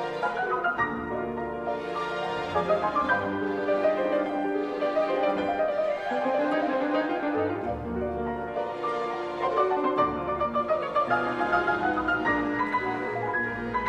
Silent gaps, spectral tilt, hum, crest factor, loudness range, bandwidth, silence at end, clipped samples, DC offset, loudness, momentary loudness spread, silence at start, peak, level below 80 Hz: none; -6.5 dB/octave; none; 16 dB; 2 LU; 9.6 kHz; 0 s; under 0.1%; under 0.1%; -27 LUFS; 6 LU; 0 s; -12 dBFS; -52 dBFS